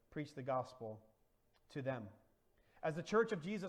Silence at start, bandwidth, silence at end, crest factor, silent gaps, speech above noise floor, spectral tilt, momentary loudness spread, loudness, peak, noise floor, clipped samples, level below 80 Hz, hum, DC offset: 0.1 s; 11 kHz; 0 s; 20 dB; none; 35 dB; -6.5 dB/octave; 15 LU; -42 LUFS; -24 dBFS; -76 dBFS; under 0.1%; -76 dBFS; none; under 0.1%